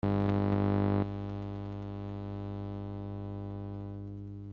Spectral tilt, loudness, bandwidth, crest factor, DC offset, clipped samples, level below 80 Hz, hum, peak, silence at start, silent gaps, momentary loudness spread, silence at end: -8.5 dB/octave; -35 LUFS; 5.2 kHz; 18 dB; under 0.1%; under 0.1%; -52 dBFS; 50 Hz at -40 dBFS; -16 dBFS; 0.05 s; none; 12 LU; 0 s